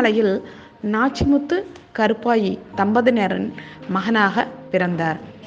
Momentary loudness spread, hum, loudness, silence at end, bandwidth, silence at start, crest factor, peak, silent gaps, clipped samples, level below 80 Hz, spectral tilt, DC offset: 10 LU; none; -20 LUFS; 0 s; 7.8 kHz; 0 s; 18 dB; -2 dBFS; none; under 0.1%; -48 dBFS; -6.5 dB/octave; under 0.1%